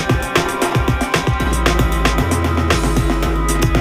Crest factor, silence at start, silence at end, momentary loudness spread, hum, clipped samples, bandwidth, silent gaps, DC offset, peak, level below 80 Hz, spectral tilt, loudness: 16 dB; 0 s; 0 s; 2 LU; none; under 0.1%; 16 kHz; none; under 0.1%; 0 dBFS; -20 dBFS; -5 dB/octave; -17 LUFS